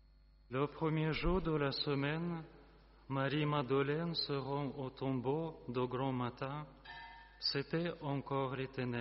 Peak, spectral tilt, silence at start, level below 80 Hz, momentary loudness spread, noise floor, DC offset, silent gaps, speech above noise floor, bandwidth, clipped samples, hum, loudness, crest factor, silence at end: -22 dBFS; -5 dB/octave; 0.5 s; -54 dBFS; 9 LU; -64 dBFS; under 0.1%; none; 27 dB; 5.8 kHz; under 0.1%; none; -38 LUFS; 16 dB; 0 s